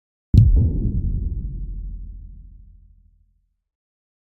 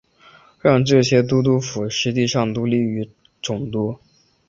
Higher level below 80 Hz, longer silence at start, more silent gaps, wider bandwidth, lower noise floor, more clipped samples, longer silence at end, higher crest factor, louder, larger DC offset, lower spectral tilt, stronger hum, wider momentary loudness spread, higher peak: first, -26 dBFS vs -54 dBFS; second, 0.35 s vs 0.65 s; neither; second, 4.5 kHz vs 7.8 kHz; first, -64 dBFS vs -50 dBFS; neither; first, 1.8 s vs 0.55 s; about the same, 22 dB vs 18 dB; about the same, -20 LUFS vs -19 LUFS; neither; first, -11 dB/octave vs -5.5 dB/octave; neither; first, 23 LU vs 13 LU; about the same, 0 dBFS vs -2 dBFS